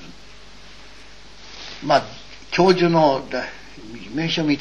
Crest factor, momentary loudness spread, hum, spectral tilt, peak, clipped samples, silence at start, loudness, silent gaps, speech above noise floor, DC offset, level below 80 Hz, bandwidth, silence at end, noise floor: 20 dB; 24 LU; none; -5.5 dB/octave; -2 dBFS; under 0.1%; 0 s; -20 LUFS; none; 27 dB; 0.9%; -50 dBFS; 9 kHz; 0 s; -45 dBFS